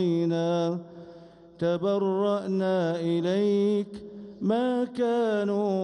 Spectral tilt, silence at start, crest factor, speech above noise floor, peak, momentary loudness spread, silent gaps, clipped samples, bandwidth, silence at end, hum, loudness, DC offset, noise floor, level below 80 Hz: -7.5 dB/octave; 0 s; 14 dB; 24 dB; -14 dBFS; 11 LU; none; under 0.1%; 10.5 kHz; 0 s; none; -26 LUFS; under 0.1%; -49 dBFS; -68 dBFS